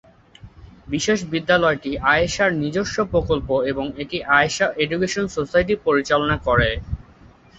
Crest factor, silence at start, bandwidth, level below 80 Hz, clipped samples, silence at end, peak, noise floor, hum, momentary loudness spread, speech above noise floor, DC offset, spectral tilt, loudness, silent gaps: 18 dB; 0.45 s; 8.2 kHz; -38 dBFS; under 0.1%; 0.55 s; -2 dBFS; -48 dBFS; none; 9 LU; 28 dB; under 0.1%; -4.5 dB/octave; -20 LUFS; none